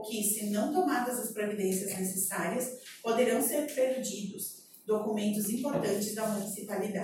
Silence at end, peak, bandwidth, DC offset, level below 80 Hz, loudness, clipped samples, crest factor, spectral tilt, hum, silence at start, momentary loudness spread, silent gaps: 0 s; -14 dBFS; 17 kHz; under 0.1%; -76 dBFS; -32 LUFS; under 0.1%; 16 dB; -4 dB/octave; none; 0 s; 8 LU; none